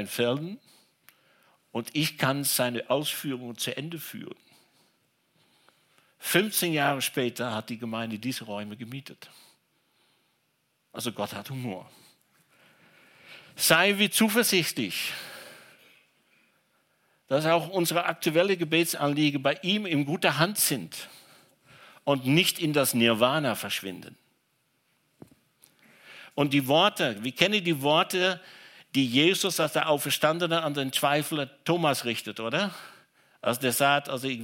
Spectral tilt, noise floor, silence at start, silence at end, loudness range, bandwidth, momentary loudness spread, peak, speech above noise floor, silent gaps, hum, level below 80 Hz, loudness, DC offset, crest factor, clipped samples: -3.5 dB/octave; -73 dBFS; 0 s; 0 s; 13 LU; 17 kHz; 16 LU; -2 dBFS; 46 dB; none; none; -76 dBFS; -26 LUFS; under 0.1%; 26 dB; under 0.1%